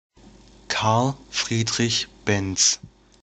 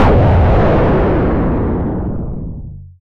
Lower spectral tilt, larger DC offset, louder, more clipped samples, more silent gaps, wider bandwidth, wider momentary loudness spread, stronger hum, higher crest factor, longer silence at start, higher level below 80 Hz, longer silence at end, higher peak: second, -3 dB/octave vs -10 dB/octave; neither; second, -22 LUFS vs -14 LUFS; neither; neither; first, 10 kHz vs 5.8 kHz; second, 7 LU vs 16 LU; neither; first, 20 dB vs 10 dB; first, 0.7 s vs 0 s; second, -52 dBFS vs -18 dBFS; first, 0.35 s vs 0.1 s; about the same, -4 dBFS vs -4 dBFS